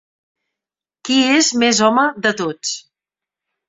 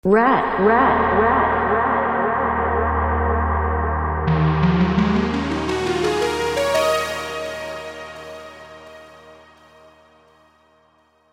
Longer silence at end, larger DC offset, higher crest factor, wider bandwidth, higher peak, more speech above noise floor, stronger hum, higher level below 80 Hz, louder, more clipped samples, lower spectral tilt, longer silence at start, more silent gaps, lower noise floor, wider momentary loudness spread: second, 0.9 s vs 2 s; neither; about the same, 18 dB vs 18 dB; second, 8.4 kHz vs 16 kHz; about the same, -2 dBFS vs -2 dBFS; first, 72 dB vs 42 dB; neither; second, -64 dBFS vs -32 dBFS; first, -15 LUFS vs -19 LUFS; neither; second, -2 dB/octave vs -6 dB/octave; first, 1.05 s vs 0.05 s; neither; first, -88 dBFS vs -58 dBFS; second, 12 LU vs 17 LU